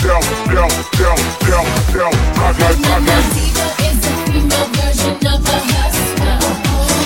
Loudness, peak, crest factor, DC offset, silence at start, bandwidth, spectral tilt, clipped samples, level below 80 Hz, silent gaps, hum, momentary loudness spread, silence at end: -14 LUFS; 0 dBFS; 12 dB; 0.3%; 0 s; 17 kHz; -4 dB/octave; under 0.1%; -18 dBFS; none; none; 3 LU; 0 s